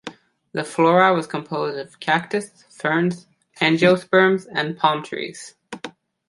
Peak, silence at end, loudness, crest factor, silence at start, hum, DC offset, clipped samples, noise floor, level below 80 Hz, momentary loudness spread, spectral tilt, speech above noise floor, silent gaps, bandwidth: -2 dBFS; 0.4 s; -20 LUFS; 20 dB; 0.05 s; none; under 0.1%; under 0.1%; -40 dBFS; -66 dBFS; 20 LU; -5.5 dB/octave; 20 dB; none; 11.5 kHz